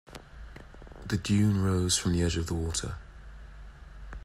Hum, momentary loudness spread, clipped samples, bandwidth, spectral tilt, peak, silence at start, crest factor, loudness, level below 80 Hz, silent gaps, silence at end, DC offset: none; 24 LU; under 0.1%; 15.5 kHz; -5 dB/octave; -14 dBFS; 0.1 s; 16 dB; -28 LUFS; -46 dBFS; none; 0 s; under 0.1%